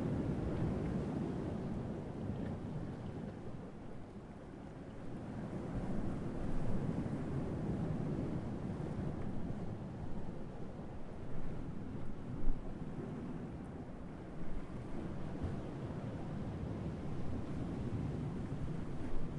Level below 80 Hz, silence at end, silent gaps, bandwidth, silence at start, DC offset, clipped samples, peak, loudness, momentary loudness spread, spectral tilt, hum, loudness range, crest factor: -48 dBFS; 0 s; none; 9.8 kHz; 0 s; under 0.1%; under 0.1%; -20 dBFS; -43 LUFS; 10 LU; -9 dB/octave; none; 6 LU; 20 dB